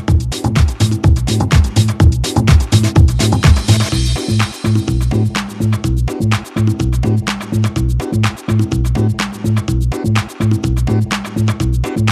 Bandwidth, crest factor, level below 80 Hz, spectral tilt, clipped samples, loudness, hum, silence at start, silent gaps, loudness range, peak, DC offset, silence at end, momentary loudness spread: 14 kHz; 14 dB; -20 dBFS; -6 dB/octave; under 0.1%; -15 LUFS; none; 0 s; none; 4 LU; 0 dBFS; under 0.1%; 0 s; 6 LU